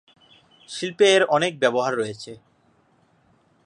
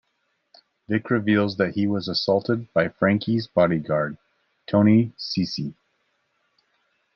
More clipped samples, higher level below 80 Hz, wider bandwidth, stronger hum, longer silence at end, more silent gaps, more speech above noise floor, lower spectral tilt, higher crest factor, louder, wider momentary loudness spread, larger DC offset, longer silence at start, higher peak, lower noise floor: neither; second, -72 dBFS vs -64 dBFS; first, 11 kHz vs 6.6 kHz; neither; second, 1.3 s vs 1.45 s; neither; second, 41 dB vs 51 dB; second, -3.5 dB/octave vs -7.5 dB/octave; about the same, 20 dB vs 18 dB; about the same, -21 LUFS vs -22 LUFS; first, 20 LU vs 9 LU; neither; second, 0.7 s vs 0.9 s; about the same, -4 dBFS vs -6 dBFS; second, -62 dBFS vs -72 dBFS